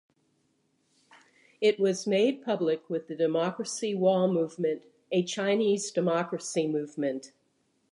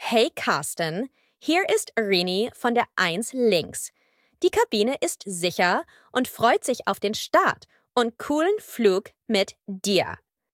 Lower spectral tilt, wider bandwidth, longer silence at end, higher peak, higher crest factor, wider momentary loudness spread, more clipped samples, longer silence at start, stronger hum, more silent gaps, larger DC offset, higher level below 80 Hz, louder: first, -5 dB/octave vs -3.5 dB/octave; second, 11.5 kHz vs 17 kHz; first, 0.65 s vs 0.4 s; second, -12 dBFS vs -6 dBFS; about the same, 16 dB vs 18 dB; about the same, 7 LU vs 8 LU; neither; first, 1.6 s vs 0 s; neither; neither; neither; second, -82 dBFS vs -64 dBFS; second, -28 LUFS vs -24 LUFS